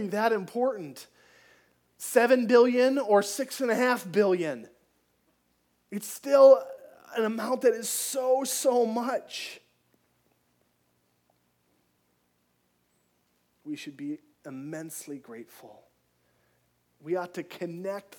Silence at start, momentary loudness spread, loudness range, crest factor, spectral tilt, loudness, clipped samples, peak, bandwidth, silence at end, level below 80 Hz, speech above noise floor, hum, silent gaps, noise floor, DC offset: 0 s; 21 LU; 18 LU; 22 dB; -4 dB/octave; -25 LUFS; under 0.1%; -6 dBFS; 19 kHz; 0.2 s; -84 dBFS; 46 dB; 60 Hz at -60 dBFS; none; -72 dBFS; under 0.1%